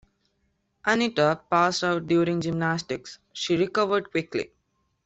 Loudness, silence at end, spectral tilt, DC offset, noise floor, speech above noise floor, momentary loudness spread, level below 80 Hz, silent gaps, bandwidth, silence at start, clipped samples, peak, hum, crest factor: -25 LUFS; 0.6 s; -5 dB/octave; under 0.1%; -73 dBFS; 48 dB; 11 LU; -62 dBFS; none; 8.2 kHz; 0.85 s; under 0.1%; -8 dBFS; none; 18 dB